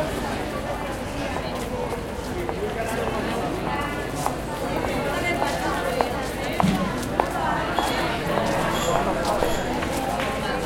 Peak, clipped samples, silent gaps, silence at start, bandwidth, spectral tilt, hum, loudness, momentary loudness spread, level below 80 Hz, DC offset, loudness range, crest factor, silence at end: -2 dBFS; under 0.1%; none; 0 s; 17 kHz; -5 dB/octave; none; -25 LUFS; 6 LU; -38 dBFS; under 0.1%; 4 LU; 24 dB; 0 s